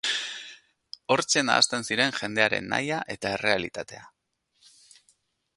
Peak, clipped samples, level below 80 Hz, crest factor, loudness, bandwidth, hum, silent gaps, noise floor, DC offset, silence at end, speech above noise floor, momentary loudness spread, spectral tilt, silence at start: -2 dBFS; under 0.1%; -64 dBFS; 26 dB; -25 LUFS; 11.5 kHz; none; none; -72 dBFS; under 0.1%; 1.5 s; 46 dB; 19 LU; -2 dB/octave; 0.05 s